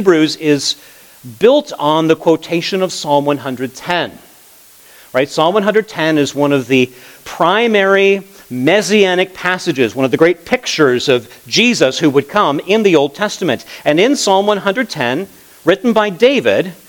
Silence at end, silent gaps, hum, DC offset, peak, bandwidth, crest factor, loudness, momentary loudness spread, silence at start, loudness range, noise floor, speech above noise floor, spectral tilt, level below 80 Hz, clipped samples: 0.15 s; none; none; under 0.1%; 0 dBFS; 19.5 kHz; 14 dB; -13 LUFS; 7 LU; 0 s; 4 LU; -43 dBFS; 30 dB; -4.5 dB/octave; -58 dBFS; under 0.1%